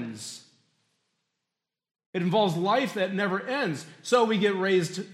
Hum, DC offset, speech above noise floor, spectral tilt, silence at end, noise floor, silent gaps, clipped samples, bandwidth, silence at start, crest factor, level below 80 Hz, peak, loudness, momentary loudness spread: none; under 0.1%; 61 dB; -5 dB/octave; 0 s; -87 dBFS; 2.06-2.13 s; under 0.1%; 15 kHz; 0 s; 18 dB; -76 dBFS; -10 dBFS; -26 LUFS; 13 LU